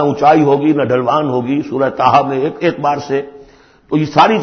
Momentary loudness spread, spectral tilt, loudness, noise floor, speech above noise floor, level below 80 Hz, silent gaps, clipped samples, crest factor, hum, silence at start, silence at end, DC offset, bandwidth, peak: 8 LU; -7 dB/octave; -14 LUFS; -43 dBFS; 30 dB; -52 dBFS; none; under 0.1%; 14 dB; none; 0 s; 0 s; under 0.1%; 6.6 kHz; 0 dBFS